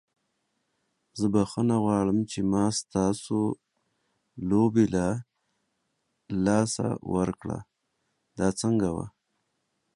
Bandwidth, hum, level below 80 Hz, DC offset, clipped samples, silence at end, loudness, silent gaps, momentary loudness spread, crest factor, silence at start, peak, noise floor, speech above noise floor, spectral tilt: 11.5 kHz; none; -54 dBFS; under 0.1%; under 0.1%; 0.85 s; -27 LUFS; none; 12 LU; 20 dB; 1.15 s; -8 dBFS; -77 dBFS; 52 dB; -6 dB/octave